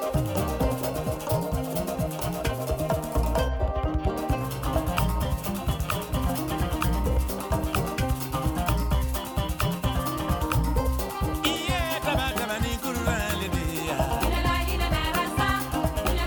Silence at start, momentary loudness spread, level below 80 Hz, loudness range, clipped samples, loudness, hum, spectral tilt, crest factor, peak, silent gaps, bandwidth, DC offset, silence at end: 0 s; 4 LU; -30 dBFS; 2 LU; under 0.1%; -27 LUFS; none; -5 dB/octave; 16 dB; -10 dBFS; none; over 20 kHz; under 0.1%; 0 s